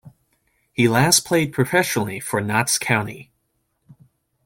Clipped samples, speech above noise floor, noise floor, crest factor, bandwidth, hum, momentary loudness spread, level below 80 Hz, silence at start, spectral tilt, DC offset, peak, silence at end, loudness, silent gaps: under 0.1%; 51 dB; -71 dBFS; 20 dB; 17 kHz; none; 11 LU; -56 dBFS; 0.05 s; -3.5 dB/octave; under 0.1%; -2 dBFS; 1.2 s; -19 LUFS; none